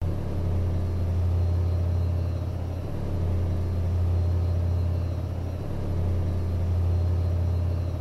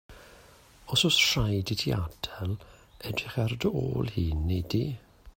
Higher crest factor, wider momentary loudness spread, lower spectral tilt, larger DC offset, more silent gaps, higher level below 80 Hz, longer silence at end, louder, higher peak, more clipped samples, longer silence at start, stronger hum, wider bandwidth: second, 10 dB vs 18 dB; second, 6 LU vs 14 LU; first, -9 dB/octave vs -4.5 dB/octave; neither; neither; first, -34 dBFS vs -44 dBFS; about the same, 0 s vs 0.05 s; about the same, -27 LUFS vs -28 LUFS; second, -16 dBFS vs -10 dBFS; neither; about the same, 0 s vs 0.1 s; neither; second, 6 kHz vs 16.5 kHz